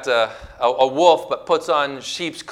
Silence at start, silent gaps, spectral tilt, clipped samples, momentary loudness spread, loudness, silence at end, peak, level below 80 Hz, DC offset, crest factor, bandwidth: 0 s; none; -3 dB/octave; under 0.1%; 10 LU; -19 LUFS; 0 s; 0 dBFS; -52 dBFS; under 0.1%; 18 dB; 13 kHz